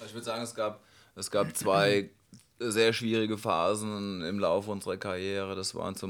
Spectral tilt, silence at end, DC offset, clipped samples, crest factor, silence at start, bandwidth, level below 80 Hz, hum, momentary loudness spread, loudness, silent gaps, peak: -4 dB/octave; 0 s; under 0.1%; under 0.1%; 20 dB; 0 s; 19 kHz; -70 dBFS; none; 10 LU; -30 LUFS; none; -10 dBFS